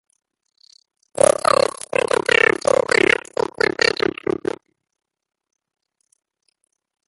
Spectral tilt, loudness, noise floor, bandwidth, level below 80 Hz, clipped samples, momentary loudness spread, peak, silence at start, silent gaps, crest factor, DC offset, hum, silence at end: -2.5 dB/octave; -18 LUFS; -82 dBFS; 12 kHz; -56 dBFS; under 0.1%; 11 LU; 0 dBFS; 1.2 s; none; 20 dB; under 0.1%; none; 3.2 s